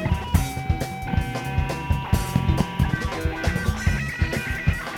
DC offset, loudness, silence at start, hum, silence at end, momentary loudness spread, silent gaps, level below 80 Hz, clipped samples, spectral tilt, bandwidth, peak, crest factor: under 0.1%; -25 LUFS; 0 s; none; 0 s; 4 LU; none; -30 dBFS; under 0.1%; -6 dB/octave; 17.5 kHz; -6 dBFS; 18 dB